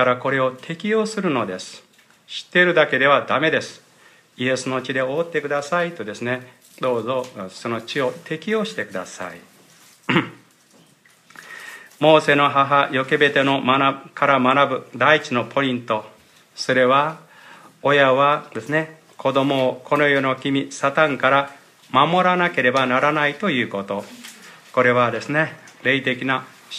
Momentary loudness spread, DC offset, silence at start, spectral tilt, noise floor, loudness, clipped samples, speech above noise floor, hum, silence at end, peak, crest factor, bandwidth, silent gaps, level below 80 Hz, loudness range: 14 LU; under 0.1%; 0 s; -5 dB/octave; -54 dBFS; -19 LUFS; under 0.1%; 35 dB; none; 0 s; 0 dBFS; 20 dB; 14.5 kHz; none; -70 dBFS; 8 LU